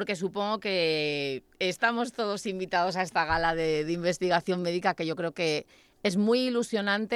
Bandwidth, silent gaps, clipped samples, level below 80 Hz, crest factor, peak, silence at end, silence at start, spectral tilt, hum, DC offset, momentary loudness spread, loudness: 14 kHz; none; under 0.1%; -56 dBFS; 18 dB; -10 dBFS; 0 s; 0 s; -4.5 dB/octave; none; under 0.1%; 5 LU; -28 LUFS